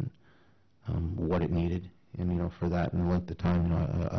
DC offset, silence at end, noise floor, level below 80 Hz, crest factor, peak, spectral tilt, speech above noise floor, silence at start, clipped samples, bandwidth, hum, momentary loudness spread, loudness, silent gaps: under 0.1%; 0 s; -65 dBFS; -40 dBFS; 10 dB; -20 dBFS; -9.5 dB/octave; 36 dB; 0 s; under 0.1%; 6.2 kHz; none; 9 LU; -31 LUFS; none